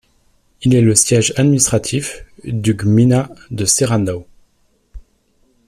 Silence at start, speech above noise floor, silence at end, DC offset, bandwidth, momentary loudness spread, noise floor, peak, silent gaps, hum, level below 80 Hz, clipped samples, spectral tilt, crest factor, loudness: 0.6 s; 45 dB; 0.7 s; under 0.1%; 15 kHz; 14 LU; -59 dBFS; 0 dBFS; none; none; -44 dBFS; under 0.1%; -5 dB/octave; 16 dB; -14 LUFS